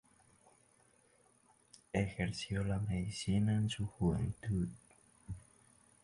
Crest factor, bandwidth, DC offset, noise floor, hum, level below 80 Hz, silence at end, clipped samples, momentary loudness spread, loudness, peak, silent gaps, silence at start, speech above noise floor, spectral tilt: 20 dB; 11.5 kHz; under 0.1%; -70 dBFS; none; -54 dBFS; 0.65 s; under 0.1%; 17 LU; -37 LUFS; -18 dBFS; none; 1.95 s; 34 dB; -6.5 dB/octave